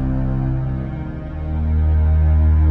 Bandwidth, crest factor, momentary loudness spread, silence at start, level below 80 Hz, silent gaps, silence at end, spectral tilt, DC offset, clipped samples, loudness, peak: 3.1 kHz; 10 dB; 12 LU; 0 s; -20 dBFS; none; 0 s; -11.5 dB/octave; under 0.1%; under 0.1%; -19 LUFS; -8 dBFS